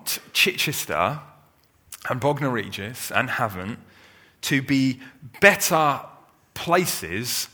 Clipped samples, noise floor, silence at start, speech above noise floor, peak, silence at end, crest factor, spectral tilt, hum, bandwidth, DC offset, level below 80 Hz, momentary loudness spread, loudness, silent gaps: under 0.1%; -59 dBFS; 0 s; 36 dB; 0 dBFS; 0.05 s; 24 dB; -3.5 dB/octave; none; over 20 kHz; under 0.1%; -60 dBFS; 18 LU; -22 LUFS; none